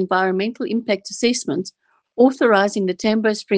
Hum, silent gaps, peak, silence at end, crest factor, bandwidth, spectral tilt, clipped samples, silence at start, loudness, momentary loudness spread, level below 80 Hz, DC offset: none; none; -2 dBFS; 0 s; 18 dB; 10 kHz; -4.5 dB/octave; under 0.1%; 0 s; -19 LUFS; 10 LU; -66 dBFS; under 0.1%